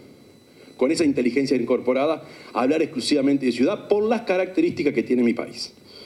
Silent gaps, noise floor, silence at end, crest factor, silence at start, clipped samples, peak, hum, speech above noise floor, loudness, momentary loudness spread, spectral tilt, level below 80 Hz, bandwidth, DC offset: none; -50 dBFS; 0 s; 16 dB; 0.8 s; under 0.1%; -6 dBFS; none; 28 dB; -22 LUFS; 8 LU; -5 dB/octave; -66 dBFS; 12 kHz; under 0.1%